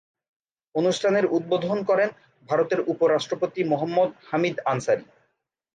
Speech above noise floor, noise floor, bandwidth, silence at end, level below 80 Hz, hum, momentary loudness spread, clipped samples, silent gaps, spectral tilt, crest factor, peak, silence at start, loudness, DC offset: 51 dB; -74 dBFS; 9.6 kHz; 0.7 s; -72 dBFS; none; 5 LU; under 0.1%; none; -5.5 dB/octave; 14 dB; -10 dBFS; 0.75 s; -24 LUFS; under 0.1%